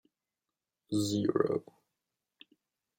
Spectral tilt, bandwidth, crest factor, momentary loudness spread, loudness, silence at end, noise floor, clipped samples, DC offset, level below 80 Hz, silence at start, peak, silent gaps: -6 dB/octave; 16.5 kHz; 22 dB; 6 LU; -32 LUFS; 1.4 s; under -90 dBFS; under 0.1%; under 0.1%; -76 dBFS; 0.9 s; -14 dBFS; none